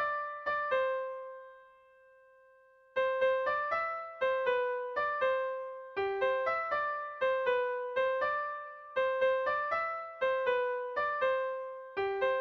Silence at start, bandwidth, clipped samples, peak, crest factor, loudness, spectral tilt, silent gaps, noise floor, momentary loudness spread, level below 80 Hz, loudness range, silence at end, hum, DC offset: 0 s; 6 kHz; under 0.1%; -20 dBFS; 14 dB; -33 LUFS; -4.5 dB/octave; none; -62 dBFS; 8 LU; -72 dBFS; 3 LU; 0 s; none; under 0.1%